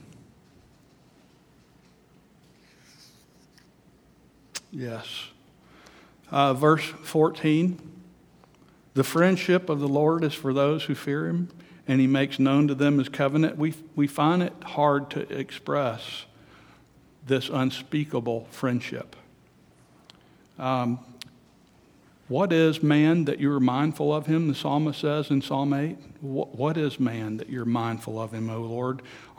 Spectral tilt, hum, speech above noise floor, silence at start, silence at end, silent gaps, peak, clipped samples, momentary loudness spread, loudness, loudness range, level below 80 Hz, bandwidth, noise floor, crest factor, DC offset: -7 dB/octave; none; 33 dB; 4.55 s; 0.15 s; none; -6 dBFS; under 0.1%; 14 LU; -25 LUFS; 9 LU; -68 dBFS; over 20 kHz; -58 dBFS; 20 dB; under 0.1%